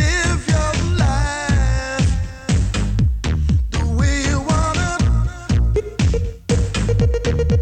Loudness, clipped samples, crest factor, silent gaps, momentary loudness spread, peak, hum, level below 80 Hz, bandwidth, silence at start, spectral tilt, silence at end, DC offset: -19 LUFS; under 0.1%; 12 dB; none; 3 LU; -4 dBFS; none; -20 dBFS; 9.6 kHz; 0 s; -5.5 dB/octave; 0 s; under 0.1%